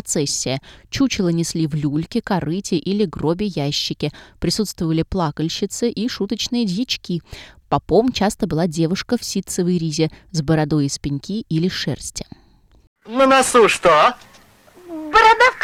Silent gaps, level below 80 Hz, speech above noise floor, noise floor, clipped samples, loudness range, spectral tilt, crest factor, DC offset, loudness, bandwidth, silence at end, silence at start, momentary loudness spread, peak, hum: 12.87-12.96 s; -44 dBFS; 29 dB; -48 dBFS; under 0.1%; 5 LU; -4.5 dB/octave; 18 dB; under 0.1%; -19 LUFS; 16 kHz; 0 s; 0.05 s; 14 LU; -2 dBFS; none